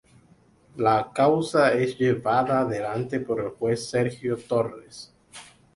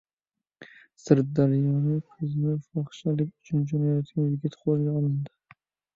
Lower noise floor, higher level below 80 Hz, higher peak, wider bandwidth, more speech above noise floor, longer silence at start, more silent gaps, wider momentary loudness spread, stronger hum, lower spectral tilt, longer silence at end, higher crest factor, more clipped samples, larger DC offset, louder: second, -58 dBFS vs -89 dBFS; first, -60 dBFS vs -66 dBFS; second, -8 dBFS vs -4 dBFS; first, 11.5 kHz vs 7.4 kHz; second, 34 dB vs 64 dB; first, 0.75 s vs 0.6 s; neither; first, 22 LU vs 8 LU; neither; second, -6 dB/octave vs -9.5 dB/octave; second, 0.35 s vs 0.7 s; second, 16 dB vs 22 dB; neither; neither; first, -24 LUFS vs -27 LUFS